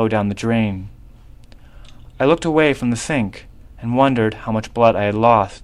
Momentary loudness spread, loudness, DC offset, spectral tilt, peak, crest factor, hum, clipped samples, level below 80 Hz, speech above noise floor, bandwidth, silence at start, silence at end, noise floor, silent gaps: 9 LU; -18 LUFS; under 0.1%; -6 dB/octave; 0 dBFS; 18 dB; none; under 0.1%; -42 dBFS; 24 dB; 12 kHz; 0 s; 0.05 s; -41 dBFS; none